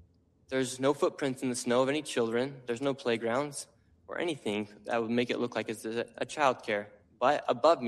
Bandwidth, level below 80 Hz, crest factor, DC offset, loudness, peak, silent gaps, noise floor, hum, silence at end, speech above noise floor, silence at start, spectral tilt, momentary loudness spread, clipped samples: 13 kHz; -72 dBFS; 20 dB; under 0.1%; -31 LUFS; -12 dBFS; none; -63 dBFS; none; 0 s; 32 dB; 0.5 s; -4.5 dB/octave; 8 LU; under 0.1%